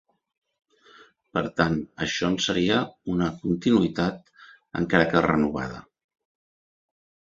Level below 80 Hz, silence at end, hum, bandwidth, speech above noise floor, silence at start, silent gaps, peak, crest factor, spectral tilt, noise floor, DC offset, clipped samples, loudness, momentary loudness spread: -52 dBFS; 1.4 s; none; 7.8 kHz; 30 dB; 1.35 s; none; -2 dBFS; 24 dB; -5.5 dB/octave; -54 dBFS; under 0.1%; under 0.1%; -24 LUFS; 11 LU